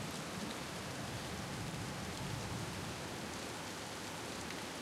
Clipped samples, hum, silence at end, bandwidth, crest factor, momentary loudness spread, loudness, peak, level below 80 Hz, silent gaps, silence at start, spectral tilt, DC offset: under 0.1%; none; 0 s; 16.5 kHz; 16 dB; 2 LU; -43 LUFS; -28 dBFS; -62 dBFS; none; 0 s; -4 dB/octave; under 0.1%